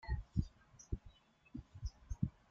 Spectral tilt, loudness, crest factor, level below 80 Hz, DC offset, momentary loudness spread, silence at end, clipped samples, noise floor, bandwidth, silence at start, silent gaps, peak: -7 dB/octave; -46 LUFS; 22 dB; -48 dBFS; under 0.1%; 13 LU; 0.2 s; under 0.1%; -63 dBFS; 7.4 kHz; 0.05 s; none; -22 dBFS